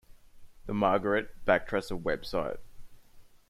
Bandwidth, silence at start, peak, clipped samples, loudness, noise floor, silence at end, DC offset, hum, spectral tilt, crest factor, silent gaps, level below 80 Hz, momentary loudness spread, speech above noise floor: 15 kHz; 0.1 s; -10 dBFS; under 0.1%; -30 LUFS; -54 dBFS; 0.15 s; under 0.1%; none; -6 dB/octave; 20 dB; none; -50 dBFS; 11 LU; 24 dB